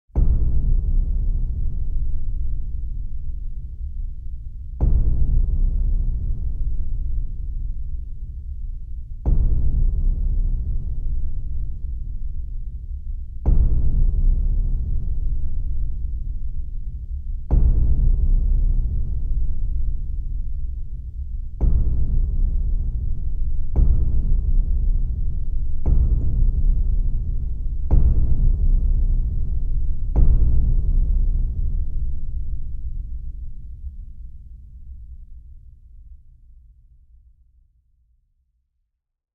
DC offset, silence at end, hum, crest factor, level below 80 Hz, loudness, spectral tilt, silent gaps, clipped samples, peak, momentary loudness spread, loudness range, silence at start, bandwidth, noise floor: under 0.1%; 3.2 s; none; 16 dB; -20 dBFS; -26 LUFS; -12 dB/octave; none; under 0.1%; -2 dBFS; 13 LU; 8 LU; 0.15 s; 1.1 kHz; -74 dBFS